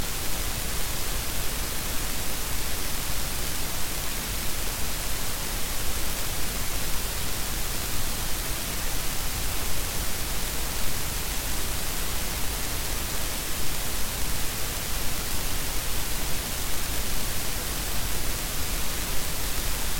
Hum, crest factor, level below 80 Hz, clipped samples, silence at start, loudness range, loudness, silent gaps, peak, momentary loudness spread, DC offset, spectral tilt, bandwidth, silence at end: none; 16 dB; -32 dBFS; under 0.1%; 0 s; 0 LU; -29 LUFS; none; -8 dBFS; 1 LU; under 0.1%; -2 dB/octave; 17 kHz; 0 s